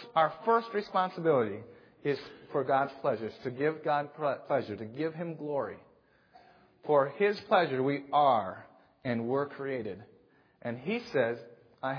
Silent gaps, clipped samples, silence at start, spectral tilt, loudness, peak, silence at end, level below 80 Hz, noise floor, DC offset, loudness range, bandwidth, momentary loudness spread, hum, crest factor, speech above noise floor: none; under 0.1%; 0 s; -8 dB/octave; -31 LUFS; -12 dBFS; 0 s; -78 dBFS; -64 dBFS; under 0.1%; 5 LU; 5.4 kHz; 14 LU; none; 20 dB; 33 dB